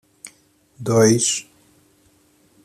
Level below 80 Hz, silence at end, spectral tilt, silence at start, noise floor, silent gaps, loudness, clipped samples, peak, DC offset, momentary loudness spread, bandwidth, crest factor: -60 dBFS; 1.2 s; -4 dB/octave; 0.25 s; -58 dBFS; none; -18 LUFS; under 0.1%; -4 dBFS; under 0.1%; 27 LU; 14 kHz; 20 dB